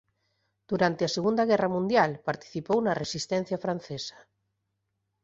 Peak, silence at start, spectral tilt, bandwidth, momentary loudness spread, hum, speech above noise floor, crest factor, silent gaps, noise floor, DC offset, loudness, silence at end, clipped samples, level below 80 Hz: -8 dBFS; 0.7 s; -5 dB/octave; 8 kHz; 10 LU; none; 52 dB; 20 dB; none; -80 dBFS; under 0.1%; -28 LUFS; 1.15 s; under 0.1%; -66 dBFS